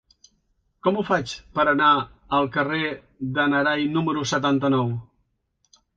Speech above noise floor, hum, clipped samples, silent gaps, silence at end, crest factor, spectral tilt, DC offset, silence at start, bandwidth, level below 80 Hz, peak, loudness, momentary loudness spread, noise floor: 49 dB; none; under 0.1%; none; 0.95 s; 18 dB; -5.5 dB/octave; under 0.1%; 0.85 s; 7.8 kHz; -56 dBFS; -6 dBFS; -22 LUFS; 10 LU; -71 dBFS